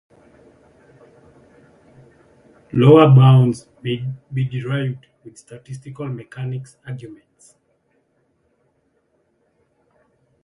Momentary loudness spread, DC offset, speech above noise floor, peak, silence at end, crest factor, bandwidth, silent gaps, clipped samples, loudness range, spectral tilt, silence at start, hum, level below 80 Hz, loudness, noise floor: 25 LU; under 0.1%; 48 dB; 0 dBFS; 3.3 s; 20 dB; 11 kHz; none; under 0.1%; 18 LU; -8.5 dB/octave; 2.75 s; none; -56 dBFS; -16 LUFS; -65 dBFS